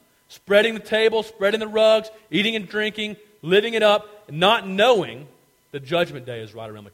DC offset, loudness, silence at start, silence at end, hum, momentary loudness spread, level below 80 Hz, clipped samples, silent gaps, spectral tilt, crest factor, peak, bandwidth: under 0.1%; -20 LUFS; 0.3 s; 0.05 s; none; 18 LU; -64 dBFS; under 0.1%; none; -4.5 dB/octave; 18 dB; -2 dBFS; 16 kHz